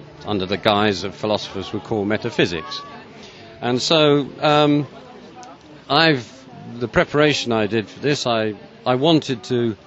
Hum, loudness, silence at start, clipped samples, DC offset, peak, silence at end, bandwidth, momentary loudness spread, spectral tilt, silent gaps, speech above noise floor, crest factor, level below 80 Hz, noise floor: none; -19 LUFS; 0 s; under 0.1%; under 0.1%; 0 dBFS; 0.1 s; 8.2 kHz; 22 LU; -5 dB/octave; none; 22 dB; 20 dB; -52 dBFS; -41 dBFS